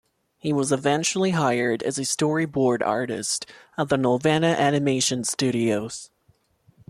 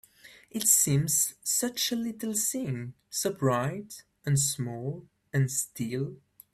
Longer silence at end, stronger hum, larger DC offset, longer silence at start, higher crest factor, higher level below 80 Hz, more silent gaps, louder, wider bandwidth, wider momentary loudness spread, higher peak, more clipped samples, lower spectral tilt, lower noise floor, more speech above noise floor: first, 0.85 s vs 0.4 s; neither; neither; first, 0.45 s vs 0.25 s; second, 16 dB vs 22 dB; about the same, -62 dBFS vs -64 dBFS; neither; first, -23 LUFS vs -28 LUFS; second, 14 kHz vs 16 kHz; second, 8 LU vs 16 LU; about the same, -8 dBFS vs -8 dBFS; neither; about the same, -4.5 dB/octave vs -3.5 dB/octave; first, -64 dBFS vs -55 dBFS; first, 41 dB vs 26 dB